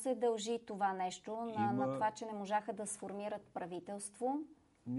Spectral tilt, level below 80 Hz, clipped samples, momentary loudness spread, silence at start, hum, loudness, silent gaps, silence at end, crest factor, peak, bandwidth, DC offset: -4.5 dB/octave; -80 dBFS; under 0.1%; 9 LU; 0 s; none; -39 LUFS; none; 0 s; 16 dB; -24 dBFS; 11.5 kHz; under 0.1%